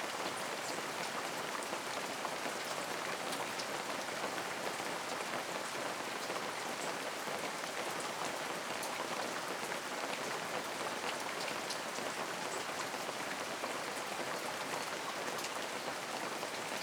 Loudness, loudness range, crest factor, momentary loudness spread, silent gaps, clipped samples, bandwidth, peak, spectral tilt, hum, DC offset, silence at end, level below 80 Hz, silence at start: -39 LUFS; 0 LU; 18 dB; 1 LU; none; under 0.1%; over 20 kHz; -22 dBFS; -1.5 dB/octave; none; under 0.1%; 0 s; -84 dBFS; 0 s